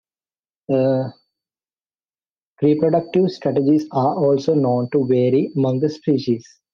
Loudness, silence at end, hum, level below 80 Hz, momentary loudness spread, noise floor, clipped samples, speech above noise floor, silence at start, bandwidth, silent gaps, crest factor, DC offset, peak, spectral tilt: -19 LUFS; 0.3 s; none; -64 dBFS; 5 LU; under -90 dBFS; under 0.1%; over 72 dB; 0.7 s; 7 kHz; 1.86-1.90 s, 2.31-2.36 s, 2.42-2.54 s; 14 dB; under 0.1%; -4 dBFS; -8.5 dB/octave